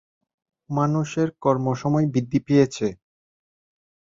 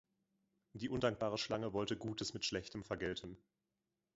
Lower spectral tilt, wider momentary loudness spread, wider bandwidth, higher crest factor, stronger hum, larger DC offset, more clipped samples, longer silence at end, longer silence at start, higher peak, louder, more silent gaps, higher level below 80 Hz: first, -7.5 dB/octave vs -4 dB/octave; second, 8 LU vs 11 LU; about the same, 7.6 kHz vs 7.6 kHz; about the same, 18 dB vs 22 dB; neither; neither; neither; first, 1.25 s vs 0.8 s; about the same, 0.7 s vs 0.75 s; first, -6 dBFS vs -20 dBFS; first, -23 LUFS vs -41 LUFS; neither; first, -58 dBFS vs -66 dBFS